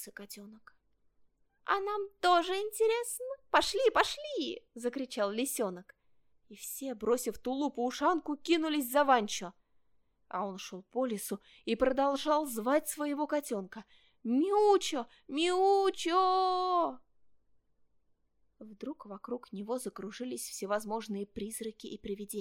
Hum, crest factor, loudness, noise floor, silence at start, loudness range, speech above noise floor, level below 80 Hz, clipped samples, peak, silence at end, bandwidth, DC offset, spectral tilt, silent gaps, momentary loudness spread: none; 22 dB; -32 LUFS; -74 dBFS; 0 s; 9 LU; 42 dB; -66 dBFS; under 0.1%; -12 dBFS; 0 s; 17 kHz; under 0.1%; -3 dB/octave; none; 15 LU